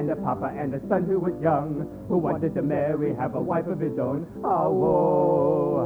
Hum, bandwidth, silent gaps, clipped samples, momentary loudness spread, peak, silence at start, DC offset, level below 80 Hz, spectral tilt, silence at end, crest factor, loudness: none; over 20 kHz; none; under 0.1%; 8 LU; -8 dBFS; 0 s; under 0.1%; -52 dBFS; -10.5 dB/octave; 0 s; 16 dB; -25 LUFS